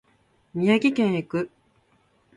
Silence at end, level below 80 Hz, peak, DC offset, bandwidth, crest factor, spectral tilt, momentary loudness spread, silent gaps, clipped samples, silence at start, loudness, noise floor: 0.9 s; -66 dBFS; -8 dBFS; under 0.1%; 11 kHz; 18 dB; -7 dB/octave; 14 LU; none; under 0.1%; 0.55 s; -23 LUFS; -64 dBFS